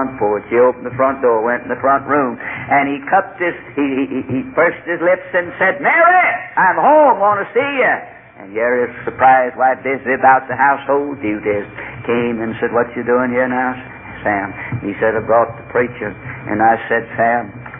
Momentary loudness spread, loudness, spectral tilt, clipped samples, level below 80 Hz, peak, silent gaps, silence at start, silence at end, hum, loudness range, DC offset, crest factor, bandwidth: 10 LU; -15 LUFS; -10 dB/octave; under 0.1%; -50 dBFS; 0 dBFS; none; 0 s; 0 s; none; 5 LU; under 0.1%; 14 dB; 3.7 kHz